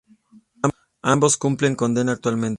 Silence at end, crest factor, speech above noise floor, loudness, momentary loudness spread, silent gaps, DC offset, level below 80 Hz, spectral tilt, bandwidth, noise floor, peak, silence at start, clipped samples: 0 s; 20 dB; 33 dB; -21 LUFS; 8 LU; none; under 0.1%; -58 dBFS; -5 dB/octave; 11.5 kHz; -53 dBFS; -2 dBFS; 0.65 s; under 0.1%